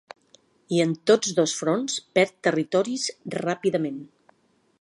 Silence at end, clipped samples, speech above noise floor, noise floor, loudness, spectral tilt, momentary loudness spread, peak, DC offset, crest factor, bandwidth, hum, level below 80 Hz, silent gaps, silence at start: 0.75 s; under 0.1%; 42 dB; -66 dBFS; -24 LUFS; -4 dB/octave; 8 LU; -6 dBFS; under 0.1%; 20 dB; 11.5 kHz; none; -74 dBFS; none; 0.7 s